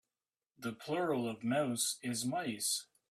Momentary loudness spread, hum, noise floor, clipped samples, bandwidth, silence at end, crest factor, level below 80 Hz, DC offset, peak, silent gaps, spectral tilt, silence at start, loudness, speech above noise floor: 8 LU; none; under -90 dBFS; under 0.1%; 16 kHz; 0.3 s; 16 dB; -80 dBFS; under 0.1%; -20 dBFS; none; -3.5 dB/octave; 0.6 s; -36 LUFS; over 54 dB